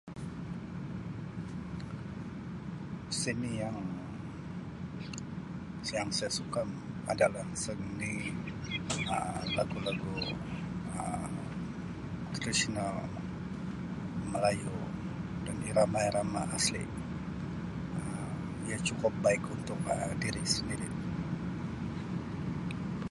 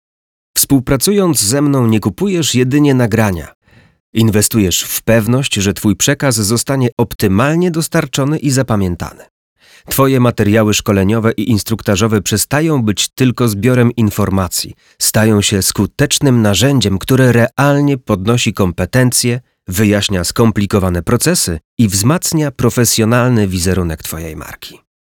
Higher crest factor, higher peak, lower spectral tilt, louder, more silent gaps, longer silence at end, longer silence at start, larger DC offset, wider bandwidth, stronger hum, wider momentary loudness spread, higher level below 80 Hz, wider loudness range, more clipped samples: first, 24 dB vs 12 dB; second, -12 dBFS vs 0 dBFS; about the same, -4.5 dB/octave vs -4.5 dB/octave; second, -36 LUFS vs -13 LUFS; second, none vs 3.55-3.61 s, 4.00-4.13 s, 6.92-6.97 s, 7.15-7.19 s, 9.30-9.56 s, 21.65-21.77 s; second, 0 s vs 0.4 s; second, 0.05 s vs 0.55 s; neither; second, 11.5 kHz vs 19.5 kHz; neither; first, 11 LU vs 6 LU; second, -52 dBFS vs -38 dBFS; first, 5 LU vs 2 LU; neither